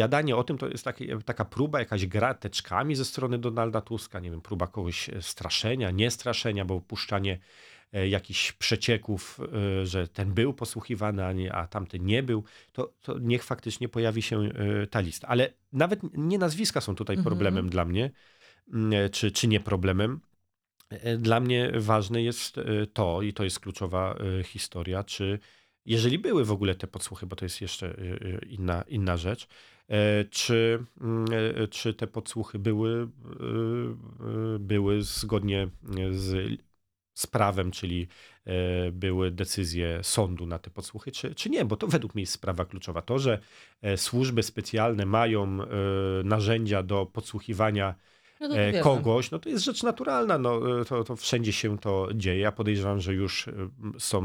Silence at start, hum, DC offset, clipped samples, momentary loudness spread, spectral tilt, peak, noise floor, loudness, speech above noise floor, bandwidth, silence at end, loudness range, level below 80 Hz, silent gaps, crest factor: 0 s; none; under 0.1%; under 0.1%; 10 LU; -5 dB/octave; -6 dBFS; -76 dBFS; -29 LUFS; 47 dB; 16.5 kHz; 0 s; 3 LU; -52 dBFS; none; 22 dB